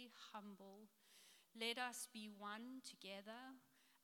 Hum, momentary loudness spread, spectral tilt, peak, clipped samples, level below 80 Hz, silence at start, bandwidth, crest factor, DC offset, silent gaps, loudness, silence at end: none; 20 LU; -2 dB/octave; -32 dBFS; under 0.1%; under -90 dBFS; 0 s; 18 kHz; 24 dB; under 0.1%; none; -52 LUFS; 0.05 s